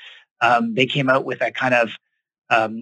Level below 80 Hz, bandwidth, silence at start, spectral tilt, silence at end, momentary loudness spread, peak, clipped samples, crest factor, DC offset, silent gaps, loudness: -78 dBFS; 9.2 kHz; 0 s; -5.5 dB/octave; 0 s; 6 LU; -2 dBFS; under 0.1%; 18 dB; under 0.1%; 0.31-0.36 s; -19 LUFS